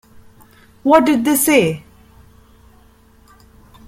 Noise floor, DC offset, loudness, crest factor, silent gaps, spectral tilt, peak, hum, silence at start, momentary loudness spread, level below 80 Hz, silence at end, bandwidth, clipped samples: -49 dBFS; under 0.1%; -14 LUFS; 18 dB; none; -4 dB/octave; -2 dBFS; none; 0.85 s; 11 LU; -50 dBFS; 2.1 s; 16.5 kHz; under 0.1%